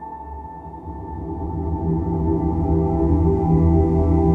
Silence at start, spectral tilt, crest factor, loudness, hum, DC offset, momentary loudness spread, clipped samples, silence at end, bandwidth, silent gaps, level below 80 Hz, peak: 0 s; -12.5 dB/octave; 14 dB; -20 LUFS; none; under 0.1%; 18 LU; under 0.1%; 0 s; 2.6 kHz; none; -26 dBFS; -6 dBFS